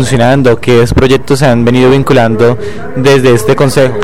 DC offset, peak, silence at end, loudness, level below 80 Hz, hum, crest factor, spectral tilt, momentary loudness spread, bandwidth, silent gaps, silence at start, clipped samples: 10%; 0 dBFS; 0 s; -7 LUFS; -28 dBFS; none; 6 dB; -6 dB/octave; 3 LU; 16.5 kHz; none; 0 s; under 0.1%